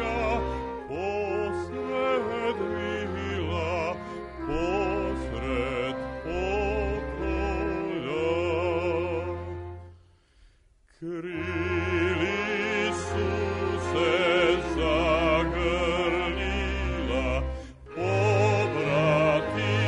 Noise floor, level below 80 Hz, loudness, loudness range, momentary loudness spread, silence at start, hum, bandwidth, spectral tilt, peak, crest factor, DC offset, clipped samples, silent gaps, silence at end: -60 dBFS; -38 dBFS; -27 LUFS; 6 LU; 10 LU; 0 s; none; 10.5 kHz; -6 dB/octave; -12 dBFS; 16 dB; under 0.1%; under 0.1%; none; 0 s